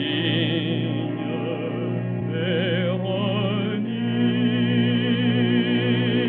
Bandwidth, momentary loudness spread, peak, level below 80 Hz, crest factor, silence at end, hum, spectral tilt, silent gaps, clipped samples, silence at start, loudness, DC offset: 4.2 kHz; 6 LU; -10 dBFS; -70 dBFS; 12 dB; 0 s; 60 Hz at -30 dBFS; -5 dB/octave; none; under 0.1%; 0 s; -23 LUFS; under 0.1%